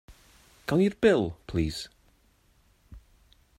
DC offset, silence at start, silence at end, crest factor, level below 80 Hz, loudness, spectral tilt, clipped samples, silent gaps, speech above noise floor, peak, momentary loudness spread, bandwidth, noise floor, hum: under 0.1%; 0.1 s; 0.6 s; 20 dB; -50 dBFS; -27 LUFS; -6.5 dB/octave; under 0.1%; none; 39 dB; -10 dBFS; 17 LU; 16 kHz; -64 dBFS; none